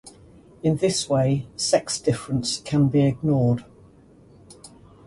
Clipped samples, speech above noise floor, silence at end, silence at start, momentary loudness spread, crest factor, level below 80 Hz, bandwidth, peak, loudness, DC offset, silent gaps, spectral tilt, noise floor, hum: under 0.1%; 30 dB; 0.4 s; 0.05 s; 5 LU; 18 dB; -52 dBFS; 11.5 kHz; -6 dBFS; -22 LUFS; under 0.1%; none; -5.5 dB/octave; -51 dBFS; none